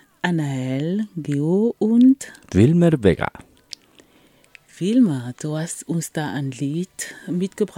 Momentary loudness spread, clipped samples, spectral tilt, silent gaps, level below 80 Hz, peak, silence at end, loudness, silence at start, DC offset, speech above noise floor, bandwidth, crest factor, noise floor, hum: 13 LU; under 0.1%; -6.5 dB/octave; none; -50 dBFS; -2 dBFS; 0.1 s; -21 LUFS; 0.25 s; under 0.1%; 35 dB; 16 kHz; 18 dB; -55 dBFS; none